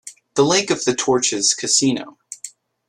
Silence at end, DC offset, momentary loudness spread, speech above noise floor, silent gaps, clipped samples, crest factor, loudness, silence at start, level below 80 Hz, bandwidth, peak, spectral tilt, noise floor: 0.4 s; under 0.1%; 18 LU; 22 dB; none; under 0.1%; 18 dB; -17 LUFS; 0.05 s; -62 dBFS; 12.5 kHz; -2 dBFS; -2.5 dB/octave; -41 dBFS